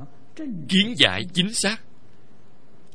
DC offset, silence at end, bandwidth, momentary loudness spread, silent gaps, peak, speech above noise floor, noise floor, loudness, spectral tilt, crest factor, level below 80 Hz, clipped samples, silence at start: 2%; 1.15 s; 10.5 kHz; 17 LU; none; 0 dBFS; 33 dB; -55 dBFS; -20 LUFS; -3 dB/octave; 26 dB; -58 dBFS; under 0.1%; 0 s